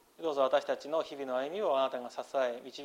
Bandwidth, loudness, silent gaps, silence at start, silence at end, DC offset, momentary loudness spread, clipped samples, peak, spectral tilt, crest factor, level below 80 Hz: 15.5 kHz; -33 LUFS; none; 0.2 s; 0 s; under 0.1%; 7 LU; under 0.1%; -14 dBFS; -3.5 dB/octave; 18 dB; -82 dBFS